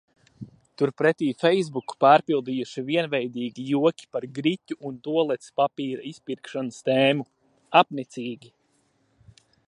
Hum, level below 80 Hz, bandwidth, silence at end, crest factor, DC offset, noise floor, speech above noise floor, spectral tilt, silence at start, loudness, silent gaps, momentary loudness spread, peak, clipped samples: none; -74 dBFS; 11 kHz; 1.3 s; 24 dB; under 0.1%; -68 dBFS; 44 dB; -6 dB/octave; 0.4 s; -24 LUFS; none; 15 LU; -2 dBFS; under 0.1%